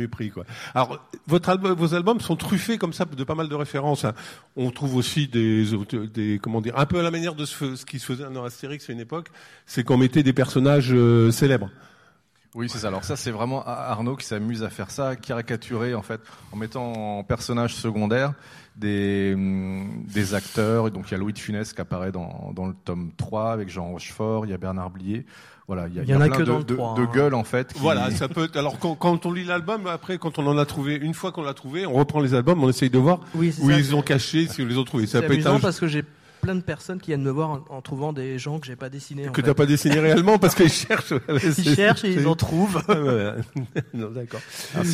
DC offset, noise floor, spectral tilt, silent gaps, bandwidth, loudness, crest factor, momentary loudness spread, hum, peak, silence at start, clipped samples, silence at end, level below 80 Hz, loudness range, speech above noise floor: under 0.1%; -60 dBFS; -6 dB/octave; none; 15.5 kHz; -23 LUFS; 18 dB; 14 LU; none; -6 dBFS; 0 s; under 0.1%; 0 s; -52 dBFS; 9 LU; 37 dB